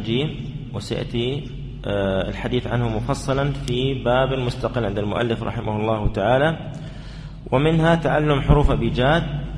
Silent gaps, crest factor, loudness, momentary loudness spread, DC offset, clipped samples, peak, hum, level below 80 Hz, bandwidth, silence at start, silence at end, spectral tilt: none; 20 dB; -22 LUFS; 13 LU; under 0.1%; under 0.1%; 0 dBFS; none; -32 dBFS; 11 kHz; 0 s; 0 s; -7 dB/octave